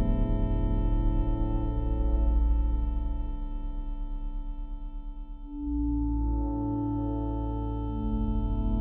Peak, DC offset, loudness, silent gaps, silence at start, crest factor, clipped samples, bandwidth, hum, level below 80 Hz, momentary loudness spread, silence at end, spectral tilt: -16 dBFS; under 0.1%; -31 LUFS; none; 0 s; 12 dB; under 0.1%; 3.3 kHz; none; -28 dBFS; 12 LU; 0 s; -10.5 dB/octave